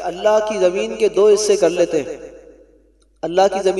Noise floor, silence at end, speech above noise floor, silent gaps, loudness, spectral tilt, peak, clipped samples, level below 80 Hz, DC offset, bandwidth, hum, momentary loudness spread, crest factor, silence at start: -54 dBFS; 0 s; 38 dB; none; -16 LUFS; -3.5 dB/octave; -2 dBFS; under 0.1%; -52 dBFS; under 0.1%; 12 kHz; none; 12 LU; 16 dB; 0 s